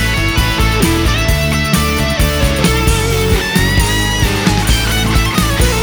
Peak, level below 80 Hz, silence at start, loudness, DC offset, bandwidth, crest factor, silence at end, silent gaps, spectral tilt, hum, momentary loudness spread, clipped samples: 0 dBFS; -18 dBFS; 0 s; -13 LUFS; under 0.1%; over 20 kHz; 12 dB; 0 s; none; -4 dB/octave; none; 1 LU; under 0.1%